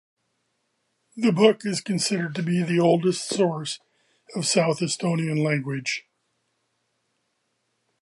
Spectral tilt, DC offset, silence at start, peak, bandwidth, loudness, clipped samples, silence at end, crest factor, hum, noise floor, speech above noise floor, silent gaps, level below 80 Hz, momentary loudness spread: -5 dB/octave; under 0.1%; 1.15 s; -4 dBFS; 11.5 kHz; -23 LUFS; under 0.1%; 2.05 s; 22 dB; none; -74 dBFS; 51 dB; none; -74 dBFS; 10 LU